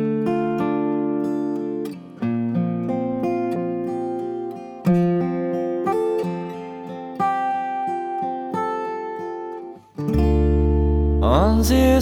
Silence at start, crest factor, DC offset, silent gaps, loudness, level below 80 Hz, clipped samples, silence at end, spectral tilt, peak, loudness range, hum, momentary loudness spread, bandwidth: 0 s; 18 dB; under 0.1%; none; -22 LUFS; -28 dBFS; under 0.1%; 0 s; -7.5 dB/octave; -2 dBFS; 5 LU; none; 12 LU; 17 kHz